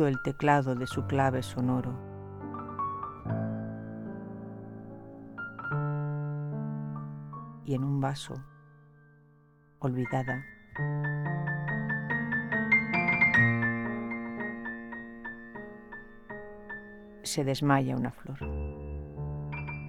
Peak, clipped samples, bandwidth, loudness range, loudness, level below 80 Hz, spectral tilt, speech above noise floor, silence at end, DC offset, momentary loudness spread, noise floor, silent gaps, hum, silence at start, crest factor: -10 dBFS; under 0.1%; 13.5 kHz; 11 LU; -31 LUFS; -52 dBFS; -6.5 dB/octave; 32 dB; 0 s; under 0.1%; 18 LU; -61 dBFS; none; none; 0 s; 20 dB